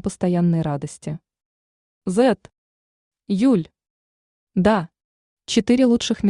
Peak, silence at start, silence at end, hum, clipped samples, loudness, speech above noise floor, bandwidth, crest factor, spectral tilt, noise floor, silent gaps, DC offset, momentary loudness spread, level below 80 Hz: -6 dBFS; 0.05 s; 0 s; none; under 0.1%; -20 LUFS; over 71 dB; 11 kHz; 16 dB; -6 dB/octave; under -90 dBFS; 1.45-2.01 s, 2.58-3.11 s, 3.90-4.47 s, 5.04-5.37 s; under 0.1%; 16 LU; -52 dBFS